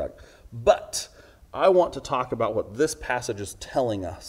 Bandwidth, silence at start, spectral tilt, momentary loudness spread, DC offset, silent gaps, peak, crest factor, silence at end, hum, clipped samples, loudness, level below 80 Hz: 16 kHz; 0 s; -4.5 dB/octave; 14 LU; under 0.1%; none; -4 dBFS; 22 dB; 0 s; none; under 0.1%; -25 LUFS; -50 dBFS